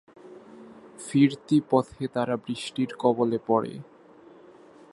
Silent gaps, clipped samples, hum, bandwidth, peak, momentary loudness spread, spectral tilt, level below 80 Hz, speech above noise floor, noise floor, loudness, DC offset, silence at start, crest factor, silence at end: none; under 0.1%; none; 11.5 kHz; -8 dBFS; 21 LU; -6.5 dB/octave; -68 dBFS; 27 dB; -52 dBFS; -26 LUFS; under 0.1%; 0.25 s; 20 dB; 1.1 s